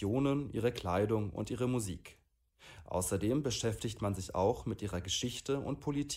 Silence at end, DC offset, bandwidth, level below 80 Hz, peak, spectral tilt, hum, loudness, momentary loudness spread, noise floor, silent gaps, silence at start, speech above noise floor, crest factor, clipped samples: 0 s; under 0.1%; 16 kHz; -56 dBFS; -18 dBFS; -5 dB/octave; none; -35 LUFS; 6 LU; -61 dBFS; none; 0 s; 27 dB; 16 dB; under 0.1%